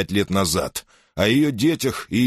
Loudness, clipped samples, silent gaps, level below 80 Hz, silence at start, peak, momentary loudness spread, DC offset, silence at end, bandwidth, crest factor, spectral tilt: -21 LUFS; under 0.1%; none; -46 dBFS; 0 s; -4 dBFS; 12 LU; under 0.1%; 0 s; 13 kHz; 16 dB; -4.5 dB/octave